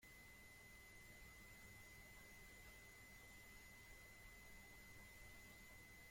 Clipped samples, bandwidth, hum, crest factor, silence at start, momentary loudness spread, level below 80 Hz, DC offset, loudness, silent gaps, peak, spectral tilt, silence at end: under 0.1%; 16.5 kHz; none; 14 dB; 0 s; 1 LU; -70 dBFS; under 0.1%; -62 LUFS; none; -50 dBFS; -3 dB/octave; 0 s